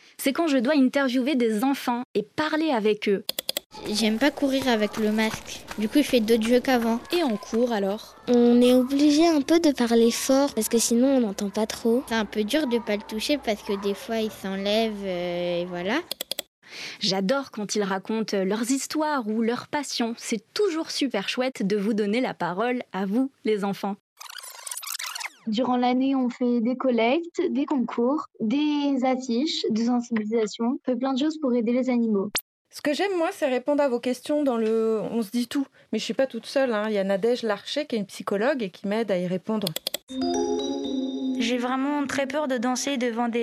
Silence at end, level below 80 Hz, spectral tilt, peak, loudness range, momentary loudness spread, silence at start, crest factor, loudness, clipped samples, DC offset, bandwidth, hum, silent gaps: 0 s; -62 dBFS; -4 dB/octave; -6 dBFS; 6 LU; 8 LU; 0.2 s; 18 dB; -25 LUFS; under 0.1%; under 0.1%; 14.5 kHz; none; 2.05-2.14 s, 3.66-3.70 s, 16.47-16.62 s, 24.00-24.16 s, 32.41-32.65 s, 40.03-40.07 s